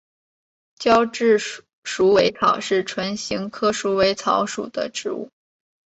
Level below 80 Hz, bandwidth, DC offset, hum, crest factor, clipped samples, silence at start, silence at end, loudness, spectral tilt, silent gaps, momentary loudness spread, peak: -56 dBFS; 8.2 kHz; under 0.1%; none; 18 dB; under 0.1%; 0.8 s; 0.6 s; -20 LUFS; -4 dB/octave; 1.73-1.83 s; 13 LU; -2 dBFS